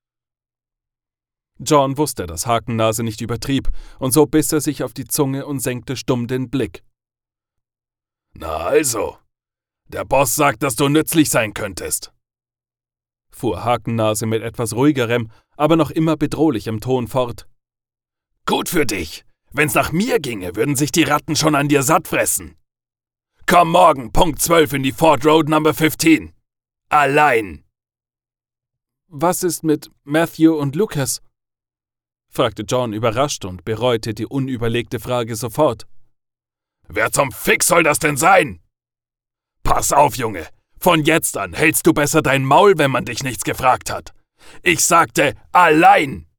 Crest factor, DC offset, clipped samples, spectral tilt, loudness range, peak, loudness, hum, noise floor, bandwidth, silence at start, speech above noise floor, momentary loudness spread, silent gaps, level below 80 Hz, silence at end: 16 dB; under 0.1%; under 0.1%; -4 dB/octave; 7 LU; -2 dBFS; -17 LUFS; none; under -90 dBFS; 19 kHz; 1.6 s; over 73 dB; 12 LU; none; -38 dBFS; 0.15 s